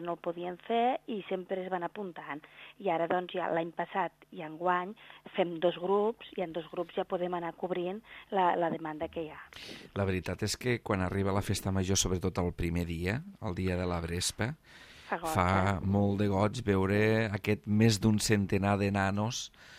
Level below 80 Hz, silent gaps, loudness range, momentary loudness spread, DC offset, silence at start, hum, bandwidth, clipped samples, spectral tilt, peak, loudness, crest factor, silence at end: -56 dBFS; none; 6 LU; 12 LU; under 0.1%; 0 s; none; 15.5 kHz; under 0.1%; -5 dB/octave; -12 dBFS; -32 LUFS; 20 dB; 0 s